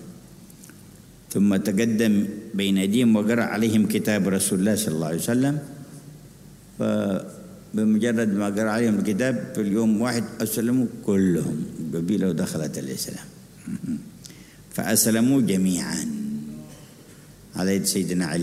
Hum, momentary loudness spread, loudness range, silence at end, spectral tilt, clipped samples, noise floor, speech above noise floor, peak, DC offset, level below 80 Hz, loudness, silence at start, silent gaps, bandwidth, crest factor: none; 17 LU; 5 LU; 0 s; -5 dB/octave; under 0.1%; -47 dBFS; 25 dB; -6 dBFS; under 0.1%; -58 dBFS; -23 LUFS; 0 s; none; 16 kHz; 18 dB